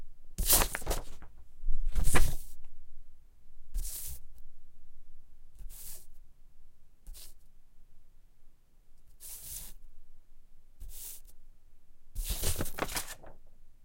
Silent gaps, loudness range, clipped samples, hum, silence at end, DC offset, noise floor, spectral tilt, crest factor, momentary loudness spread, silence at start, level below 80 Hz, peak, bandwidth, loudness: none; 19 LU; under 0.1%; none; 0.15 s; under 0.1%; -52 dBFS; -2.5 dB/octave; 24 dB; 24 LU; 0 s; -38 dBFS; -6 dBFS; 16.5 kHz; -34 LUFS